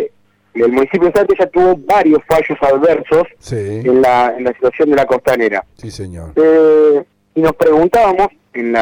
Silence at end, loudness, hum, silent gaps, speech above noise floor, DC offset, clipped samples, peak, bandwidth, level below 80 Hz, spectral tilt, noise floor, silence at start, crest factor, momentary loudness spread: 0 s; -12 LUFS; none; none; 27 dB; under 0.1%; under 0.1%; 0 dBFS; over 20 kHz; -42 dBFS; -6.5 dB/octave; -38 dBFS; 0 s; 12 dB; 12 LU